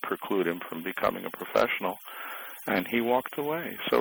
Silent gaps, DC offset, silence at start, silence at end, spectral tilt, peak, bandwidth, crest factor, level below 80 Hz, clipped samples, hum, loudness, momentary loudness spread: none; under 0.1%; 0 s; 0 s; -5 dB/octave; -12 dBFS; over 20 kHz; 18 dB; -64 dBFS; under 0.1%; none; -30 LUFS; 11 LU